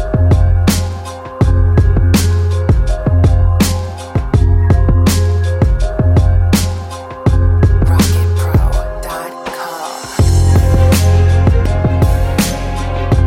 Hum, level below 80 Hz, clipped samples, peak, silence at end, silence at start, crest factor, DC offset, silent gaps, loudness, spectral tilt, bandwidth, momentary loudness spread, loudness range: none; -16 dBFS; under 0.1%; 0 dBFS; 0 s; 0 s; 10 dB; under 0.1%; none; -13 LUFS; -6.5 dB/octave; 16 kHz; 12 LU; 2 LU